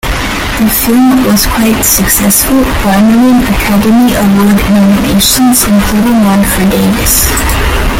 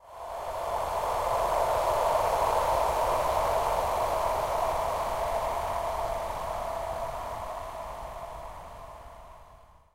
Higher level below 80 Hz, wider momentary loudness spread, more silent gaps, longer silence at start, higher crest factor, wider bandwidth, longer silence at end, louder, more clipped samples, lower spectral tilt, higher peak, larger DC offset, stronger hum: first, -18 dBFS vs -44 dBFS; second, 3 LU vs 15 LU; neither; about the same, 0.05 s vs 0.05 s; second, 8 dB vs 16 dB; first, 19 kHz vs 16 kHz; second, 0 s vs 0.3 s; first, -7 LUFS vs -29 LUFS; first, 0.2% vs under 0.1%; about the same, -4 dB/octave vs -3.5 dB/octave; first, 0 dBFS vs -14 dBFS; neither; neither